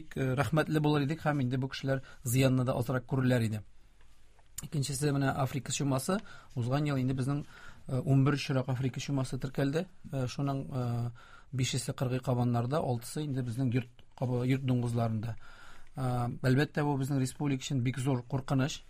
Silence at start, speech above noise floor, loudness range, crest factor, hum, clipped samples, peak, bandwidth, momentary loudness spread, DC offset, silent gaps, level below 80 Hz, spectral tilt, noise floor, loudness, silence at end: 0 s; 23 dB; 3 LU; 18 dB; none; under 0.1%; -14 dBFS; 15.5 kHz; 9 LU; under 0.1%; none; -54 dBFS; -6 dB/octave; -54 dBFS; -32 LUFS; 0.05 s